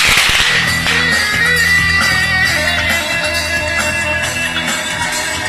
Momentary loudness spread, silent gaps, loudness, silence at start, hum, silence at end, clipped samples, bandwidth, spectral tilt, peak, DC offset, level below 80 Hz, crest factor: 6 LU; none; -12 LUFS; 0 s; none; 0 s; under 0.1%; 14 kHz; -2 dB/octave; 0 dBFS; under 0.1%; -32 dBFS; 14 dB